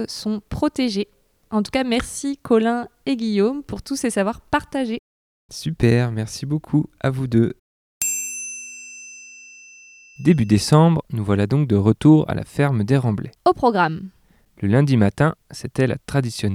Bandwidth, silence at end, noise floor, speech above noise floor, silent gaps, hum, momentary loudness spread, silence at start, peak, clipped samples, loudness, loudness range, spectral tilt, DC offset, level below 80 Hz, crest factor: 16.5 kHz; 0 s; -47 dBFS; 27 dB; 4.99-5.49 s, 7.59-8.01 s; none; 16 LU; 0 s; -2 dBFS; under 0.1%; -20 LUFS; 6 LU; -6 dB/octave; under 0.1%; -46 dBFS; 20 dB